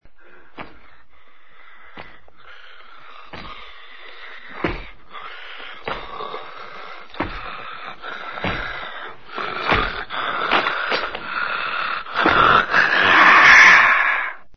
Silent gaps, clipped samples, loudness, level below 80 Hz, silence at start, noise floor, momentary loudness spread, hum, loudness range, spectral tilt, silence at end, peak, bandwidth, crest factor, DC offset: none; under 0.1%; -15 LUFS; -44 dBFS; 0 s; -54 dBFS; 27 LU; none; 22 LU; -3 dB/octave; 0.2 s; 0 dBFS; 6.6 kHz; 20 dB; 1%